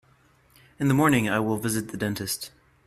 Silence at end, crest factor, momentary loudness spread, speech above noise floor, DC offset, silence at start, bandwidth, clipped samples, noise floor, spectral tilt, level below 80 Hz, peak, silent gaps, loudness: 0.4 s; 18 dB; 10 LU; 36 dB; under 0.1%; 0.8 s; 15.5 kHz; under 0.1%; -60 dBFS; -5 dB/octave; -56 dBFS; -8 dBFS; none; -25 LUFS